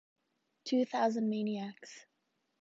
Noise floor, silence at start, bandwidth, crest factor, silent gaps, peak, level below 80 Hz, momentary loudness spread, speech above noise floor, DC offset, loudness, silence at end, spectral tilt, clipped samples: -81 dBFS; 0.65 s; 7.8 kHz; 18 dB; none; -18 dBFS; -88 dBFS; 20 LU; 47 dB; under 0.1%; -34 LUFS; 0.6 s; -5.5 dB/octave; under 0.1%